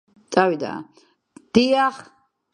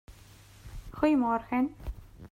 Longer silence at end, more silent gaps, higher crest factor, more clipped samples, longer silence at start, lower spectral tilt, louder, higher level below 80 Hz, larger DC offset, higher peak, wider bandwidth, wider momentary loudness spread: first, 0.5 s vs 0.05 s; neither; about the same, 22 dB vs 18 dB; neither; first, 0.3 s vs 0.1 s; second, -5 dB/octave vs -7 dB/octave; first, -20 LUFS vs -28 LUFS; second, -60 dBFS vs -48 dBFS; neither; first, -2 dBFS vs -12 dBFS; second, 10 kHz vs 15.5 kHz; second, 16 LU vs 22 LU